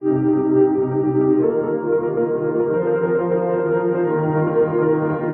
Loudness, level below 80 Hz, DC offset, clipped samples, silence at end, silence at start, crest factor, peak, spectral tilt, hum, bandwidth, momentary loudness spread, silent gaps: -19 LUFS; -58 dBFS; under 0.1%; under 0.1%; 0 s; 0 s; 12 dB; -6 dBFS; -13.5 dB/octave; none; 3 kHz; 4 LU; none